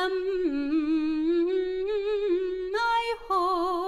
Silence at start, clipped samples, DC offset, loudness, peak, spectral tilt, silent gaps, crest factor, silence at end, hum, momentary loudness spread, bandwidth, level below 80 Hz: 0 s; under 0.1%; under 0.1%; -27 LUFS; -16 dBFS; -4 dB/octave; none; 10 dB; 0 s; none; 3 LU; 12 kHz; -52 dBFS